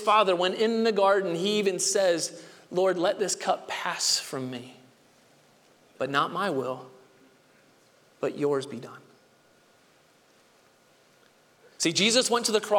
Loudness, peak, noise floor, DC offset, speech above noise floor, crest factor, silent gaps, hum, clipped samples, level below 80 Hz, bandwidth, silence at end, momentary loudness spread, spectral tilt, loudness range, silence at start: -26 LUFS; -10 dBFS; -61 dBFS; under 0.1%; 35 dB; 20 dB; none; none; under 0.1%; -78 dBFS; 18 kHz; 0 s; 13 LU; -2.5 dB/octave; 11 LU; 0 s